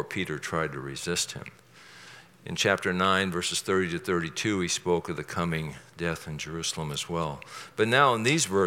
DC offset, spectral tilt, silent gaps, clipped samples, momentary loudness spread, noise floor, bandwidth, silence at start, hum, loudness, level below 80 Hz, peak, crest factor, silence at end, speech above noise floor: under 0.1%; -3.5 dB/octave; none; under 0.1%; 15 LU; -50 dBFS; 17 kHz; 0 s; none; -28 LUFS; -60 dBFS; -6 dBFS; 24 dB; 0 s; 22 dB